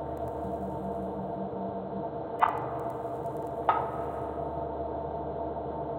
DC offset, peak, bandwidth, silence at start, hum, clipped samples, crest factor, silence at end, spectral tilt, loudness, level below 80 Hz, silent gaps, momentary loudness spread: under 0.1%; -8 dBFS; 16.5 kHz; 0 s; none; under 0.1%; 26 dB; 0 s; -8.5 dB/octave; -33 LUFS; -52 dBFS; none; 7 LU